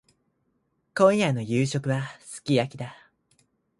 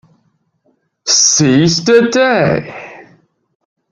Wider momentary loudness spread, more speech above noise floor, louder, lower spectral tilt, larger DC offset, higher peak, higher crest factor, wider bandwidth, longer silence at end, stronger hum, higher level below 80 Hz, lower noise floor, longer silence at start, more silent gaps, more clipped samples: second, 17 LU vs 20 LU; about the same, 48 dB vs 50 dB; second, -25 LUFS vs -10 LUFS; first, -6 dB/octave vs -3.5 dB/octave; neither; second, -6 dBFS vs 0 dBFS; first, 22 dB vs 14 dB; about the same, 11.5 kHz vs 11 kHz; about the same, 0.85 s vs 0.9 s; neither; second, -64 dBFS vs -52 dBFS; first, -73 dBFS vs -61 dBFS; about the same, 0.95 s vs 1.05 s; neither; neither